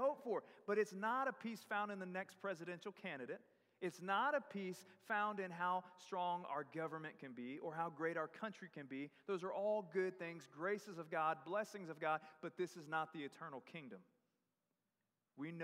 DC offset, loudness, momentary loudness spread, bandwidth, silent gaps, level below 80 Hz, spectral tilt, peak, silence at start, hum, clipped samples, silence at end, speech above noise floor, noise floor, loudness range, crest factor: under 0.1%; -45 LUFS; 11 LU; 15.5 kHz; none; under -90 dBFS; -5.5 dB/octave; -26 dBFS; 0 s; none; under 0.1%; 0 s; over 45 dB; under -90 dBFS; 4 LU; 18 dB